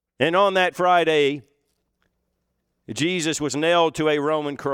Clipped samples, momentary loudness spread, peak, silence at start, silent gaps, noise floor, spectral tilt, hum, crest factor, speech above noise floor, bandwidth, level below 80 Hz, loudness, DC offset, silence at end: under 0.1%; 7 LU; -4 dBFS; 0.2 s; none; -74 dBFS; -4 dB/octave; none; 18 dB; 54 dB; 16 kHz; -64 dBFS; -20 LUFS; under 0.1%; 0 s